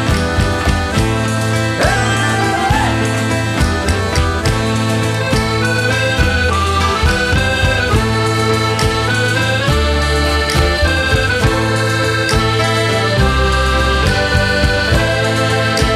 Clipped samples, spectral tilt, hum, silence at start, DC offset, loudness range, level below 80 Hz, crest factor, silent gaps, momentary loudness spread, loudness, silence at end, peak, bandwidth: under 0.1%; -4.5 dB/octave; none; 0 s; under 0.1%; 1 LU; -22 dBFS; 14 dB; none; 2 LU; -14 LUFS; 0 s; 0 dBFS; 14 kHz